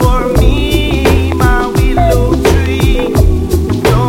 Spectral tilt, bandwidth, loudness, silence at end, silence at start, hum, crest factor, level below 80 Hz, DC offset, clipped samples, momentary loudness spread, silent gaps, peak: -6.5 dB/octave; 16.5 kHz; -11 LUFS; 0 s; 0 s; none; 10 dB; -14 dBFS; under 0.1%; 0.4%; 2 LU; none; 0 dBFS